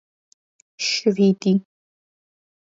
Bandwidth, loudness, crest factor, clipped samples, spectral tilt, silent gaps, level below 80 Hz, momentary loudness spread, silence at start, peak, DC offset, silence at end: 7.8 kHz; -20 LUFS; 18 dB; under 0.1%; -5 dB/octave; none; -68 dBFS; 6 LU; 0.8 s; -6 dBFS; under 0.1%; 1.1 s